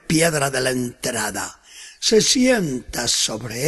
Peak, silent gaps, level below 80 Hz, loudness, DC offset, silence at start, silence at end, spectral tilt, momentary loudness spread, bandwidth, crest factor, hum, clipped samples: -4 dBFS; none; -48 dBFS; -19 LUFS; under 0.1%; 0.1 s; 0 s; -3 dB/octave; 13 LU; 12.5 kHz; 16 dB; none; under 0.1%